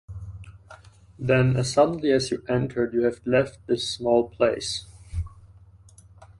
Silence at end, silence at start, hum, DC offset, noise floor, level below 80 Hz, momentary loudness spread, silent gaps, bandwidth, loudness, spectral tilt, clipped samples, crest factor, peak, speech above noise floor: 0.15 s; 0.1 s; none; under 0.1%; -51 dBFS; -46 dBFS; 16 LU; none; 11.5 kHz; -24 LUFS; -5.5 dB/octave; under 0.1%; 20 dB; -6 dBFS; 28 dB